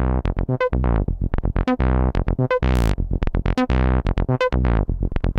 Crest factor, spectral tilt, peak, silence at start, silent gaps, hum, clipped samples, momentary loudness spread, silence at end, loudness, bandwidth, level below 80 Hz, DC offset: 14 dB; -8 dB/octave; -4 dBFS; 0 s; none; none; under 0.1%; 5 LU; 0 s; -22 LUFS; 8 kHz; -22 dBFS; under 0.1%